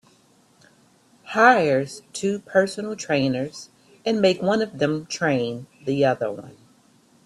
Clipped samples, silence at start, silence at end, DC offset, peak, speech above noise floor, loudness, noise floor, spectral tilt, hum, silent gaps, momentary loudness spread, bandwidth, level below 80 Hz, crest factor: under 0.1%; 1.25 s; 0.75 s; under 0.1%; 0 dBFS; 36 dB; -22 LUFS; -58 dBFS; -5 dB/octave; none; none; 14 LU; 12.5 kHz; -64 dBFS; 22 dB